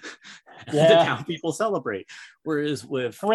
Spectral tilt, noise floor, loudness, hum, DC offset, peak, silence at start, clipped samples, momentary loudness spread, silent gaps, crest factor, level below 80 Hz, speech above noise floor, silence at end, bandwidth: -5 dB/octave; -47 dBFS; -23 LUFS; none; under 0.1%; -6 dBFS; 0.05 s; under 0.1%; 24 LU; none; 18 dB; -70 dBFS; 24 dB; 0 s; 12.5 kHz